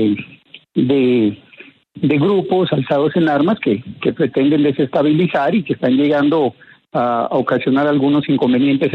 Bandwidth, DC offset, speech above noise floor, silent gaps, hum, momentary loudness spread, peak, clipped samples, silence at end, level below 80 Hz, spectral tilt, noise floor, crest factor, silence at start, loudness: 4.9 kHz; under 0.1%; 28 dB; none; none; 6 LU; -2 dBFS; under 0.1%; 0 s; -58 dBFS; -9 dB/octave; -43 dBFS; 12 dB; 0 s; -16 LUFS